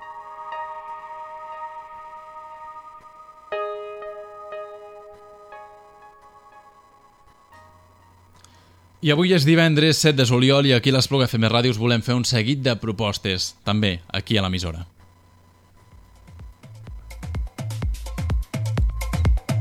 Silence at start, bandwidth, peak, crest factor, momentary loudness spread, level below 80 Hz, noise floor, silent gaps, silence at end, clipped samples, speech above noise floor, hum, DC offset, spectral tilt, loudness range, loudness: 0 s; 16.5 kHz; -2 dBFS; 22 dB; 25 LU; -34 dBFS; -53 dBFS; none; 0 s; under 0.1%; 34 dB; none; under 0.1%; -5 dB/octave; 19 LU; -21 LUFS